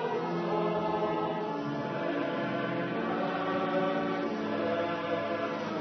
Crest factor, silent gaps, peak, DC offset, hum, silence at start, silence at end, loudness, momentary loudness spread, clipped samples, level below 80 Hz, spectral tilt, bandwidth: 14 dB; none; -18 dBFS; under 0.1%; none; 0 s; 0 s; -32 LUFS; 3 LU; under 0.1%; -72 dBFS; -4.5 dB/octave; 6.2 kHz